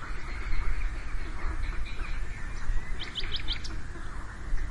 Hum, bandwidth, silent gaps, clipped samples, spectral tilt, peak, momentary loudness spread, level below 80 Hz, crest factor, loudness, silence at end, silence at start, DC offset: none; 10.5 kHz; none; under 0.1%; -4 dB/octave; -14 dBFS; 7 LU; -32 dBFS; 14 dB; -37 LUFS; 0 s; 0 s; 0.4%